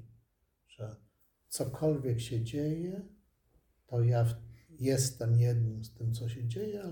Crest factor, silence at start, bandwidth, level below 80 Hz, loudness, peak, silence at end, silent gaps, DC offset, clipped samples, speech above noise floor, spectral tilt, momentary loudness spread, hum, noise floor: 16 dB; 0 s; 18 kHz; -62 dBFS; -33 LUFS; -18 dBFS; 0 s; none; under 0.1%; under 0.1%; 43 dB; -6.5 dB/octave; 16 LU; none; -75 dBFS